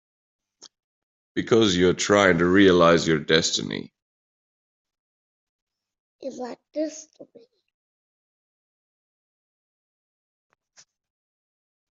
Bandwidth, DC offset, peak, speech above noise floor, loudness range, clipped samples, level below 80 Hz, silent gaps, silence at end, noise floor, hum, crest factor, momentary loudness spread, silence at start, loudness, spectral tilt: 8.2 kHz; under 0.1%; -2 dBFS; 38 dB; 19 LU; under 0.1%; -62 dBFS; 4.02-4.85 s, 4.99-5.67 s, 6.00-6.19 s; 4.7 s; -59 dBFS; none; 24 dB; 19 LU; 1.35 s; -20 LUFS; -4.5 dB/octave